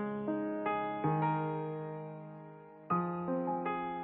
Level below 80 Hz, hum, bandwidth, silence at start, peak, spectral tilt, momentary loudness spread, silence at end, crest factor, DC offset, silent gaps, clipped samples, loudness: -72 dBFS; none; 4 kHz; 0 s; -20 dBFS; -7 dB/octave; 16 LU; 0 s; 16 dB; under 0.1%; none; under 0.1%; -35 LUFS